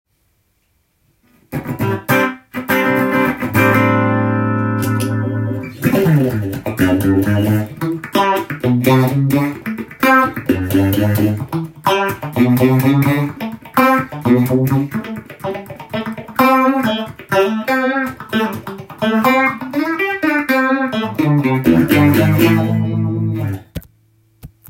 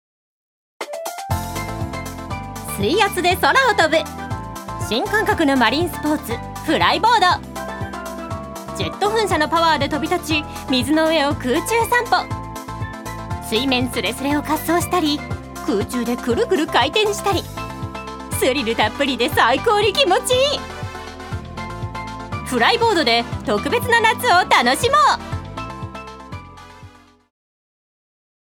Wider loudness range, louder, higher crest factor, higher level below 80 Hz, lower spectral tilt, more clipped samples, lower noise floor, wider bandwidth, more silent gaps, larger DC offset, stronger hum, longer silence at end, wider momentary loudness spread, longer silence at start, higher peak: about the same, 3 LU vs 4 LU; first, -15 LUFS vs -18 LUFS; about the same, 16 dB vs 20 dB; second, -48 dBFS vs -40 dBFS; first, -7 dB/octave vs -4 dB/octave; neither; first, -62 dBFS vs -44 dBFS; second, 17 kHz vs over 20 kHz; neither; neither; neither; second, 0.2 s vs 1.6 s; second, 12 LU vs 15 LU; first, 1.5 s vs 0.8 s; about the same, 0 dBFS vs 0 dBFS